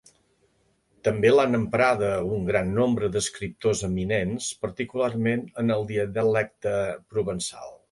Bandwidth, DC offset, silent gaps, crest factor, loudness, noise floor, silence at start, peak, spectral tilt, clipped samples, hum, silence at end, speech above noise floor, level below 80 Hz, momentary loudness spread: 11.5 kHz; under 0.1%; none; 18 dB; -25 LUFS; -67 dBFS; 1.05 s; -8 dBFS; -5.5 dB/octave; under 0.1%; none; 0.15 s; 43 dB; -50 dBFS; 9 LU